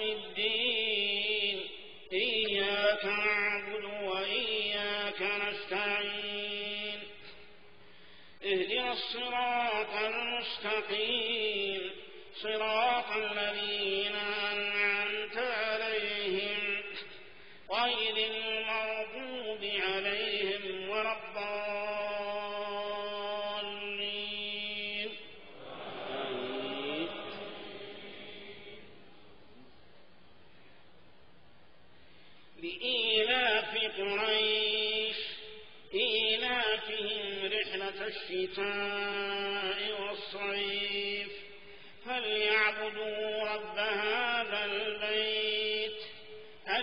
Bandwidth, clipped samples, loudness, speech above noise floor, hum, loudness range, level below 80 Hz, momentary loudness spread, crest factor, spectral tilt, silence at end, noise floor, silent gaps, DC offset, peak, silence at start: 5.4 kHz; under 0.1%; -32 LUFS; 30 dB; none; 7 LU; -68 dBFS; 15 LU; 20 dB; 1 dB/octave; 0 s; -62 dBFS; none; 0.2%; -16 dBFS; 0 s